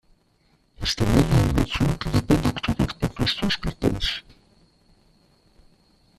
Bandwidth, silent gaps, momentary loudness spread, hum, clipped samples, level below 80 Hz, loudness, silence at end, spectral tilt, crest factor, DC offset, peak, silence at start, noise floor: 14.5 kHz; none; 7 LU; none; under 0.1%; -34 dBFS; -23 LUFS; 2 s; -5.5 dB/octave; 20 dB; under 0.1%; -4 dBFS; 0.8 s; -63 dBFS